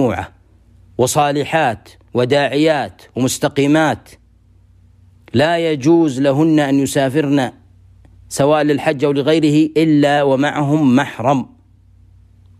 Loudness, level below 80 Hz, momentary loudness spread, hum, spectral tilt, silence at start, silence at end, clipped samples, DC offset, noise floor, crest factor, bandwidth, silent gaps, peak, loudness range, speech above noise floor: -15 LUFS; -50 dBFS; 9 LU; 60 Hz at -50 dBFS; -5.5 dB/octave; 0 s; 1.1 s; under 0.1%; under 0.1%; -49 dBFS; 12 dB; 15 kHz; none; -4 dBFS; 3 LU; 35 dB